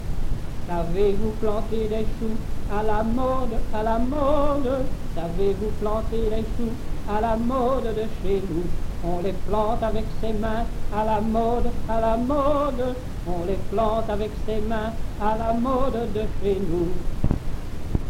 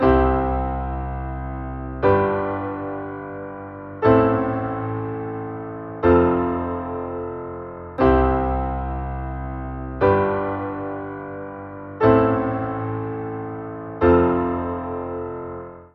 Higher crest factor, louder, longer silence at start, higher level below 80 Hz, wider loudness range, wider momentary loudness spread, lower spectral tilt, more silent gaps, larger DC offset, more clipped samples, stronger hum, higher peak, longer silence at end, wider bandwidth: about the same, 16 dB vs 20 dB; second, -26 LUFS vs -22 LUFS; about the same, 0 s vs 0 s; first, -28 dBFS vs -34 dBFS; about the same, 2 LU vs 3 LU; second, 8 LU vs 16 LU; about the same, -7.5 dB/octave vs -7.5 dB/octave; neither; neither; neither; neither; about the same, -4 dBFS vs -2 dBFS; about the same, 0 s vs 0.1 s; first, 11 kHz vs 5.4 kHz